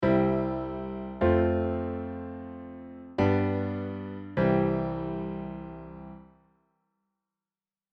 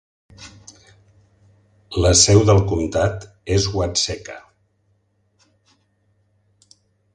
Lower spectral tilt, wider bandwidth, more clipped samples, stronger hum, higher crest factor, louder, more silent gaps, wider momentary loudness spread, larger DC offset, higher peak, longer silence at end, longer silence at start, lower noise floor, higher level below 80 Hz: first, -10 dB/octave vs -4 dB/octave; second, 6.2 kHz vs 11 kHz; neither; neither; about the same, 18 dB vs 22 dB; second, -29 LUFS vs -17 LUFS; neither; second, 18 LU vs 26 LU; neither; second, -12 dBFS vs 0 dBFS; second, 1.75 s vs 2.75 s; second, 0 s vs 0.4 s; first, under -90 dBFS vs -65 dBFS; second, -48 dBFS vs -36 dBFS